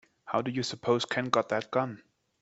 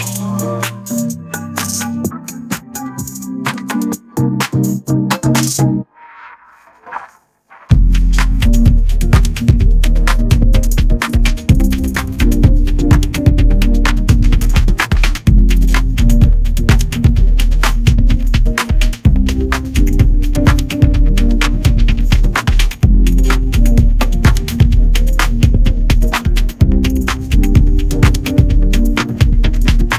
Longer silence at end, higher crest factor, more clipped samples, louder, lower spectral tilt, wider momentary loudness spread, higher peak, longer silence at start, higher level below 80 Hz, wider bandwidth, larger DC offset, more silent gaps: first, 0.45 s vs 0 s; first, 22 dB vs 10 dB; second, under 0.1% vs 0.4%; second, -30 LUFS vs -14 LUFS; about the same, -5 dB/octave vs -5.5 dB/octave; about the same, 6 LU vs 7 LU; second, -8 dBFS vs 0 dBFS; first, 0.25 s vs 0 s; second, -70 dBFS vs -12 dBFS; second, 8.2 kHz vs 15.5 kHz; neither; neither